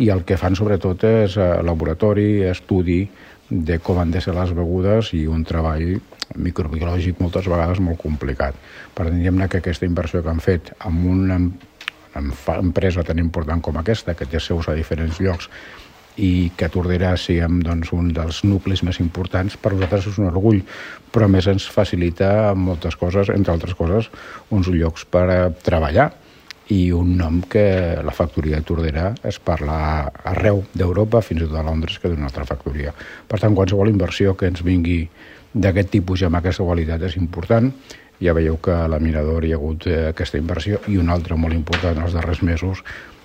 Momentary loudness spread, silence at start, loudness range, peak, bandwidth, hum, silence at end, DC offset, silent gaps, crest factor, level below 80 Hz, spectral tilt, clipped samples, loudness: 8 LU; 0 s; 3 LU; 0 dBFS; 8.6 kHz; none; 0.15 s; under 0.1%; none; 18 dB; -30 dBFS; -7.5 dB/octave; under 0.1%; -20 LUFS